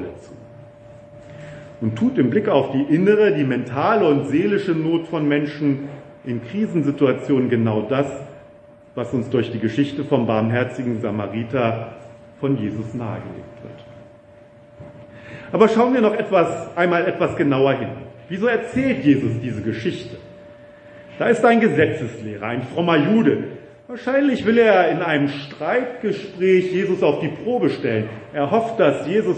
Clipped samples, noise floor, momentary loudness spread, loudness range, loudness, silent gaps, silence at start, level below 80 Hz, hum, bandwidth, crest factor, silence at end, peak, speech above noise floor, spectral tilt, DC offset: under 0.1%; -46 dBFS; 17 LU; 5 LU; -20 LUFS; none; 0 s; -58 dBFS; none; 8.8 kHz; 20 dB; 0 s; 0 dBFS; 27 dB; -7.5 dB/octave; under 0.1%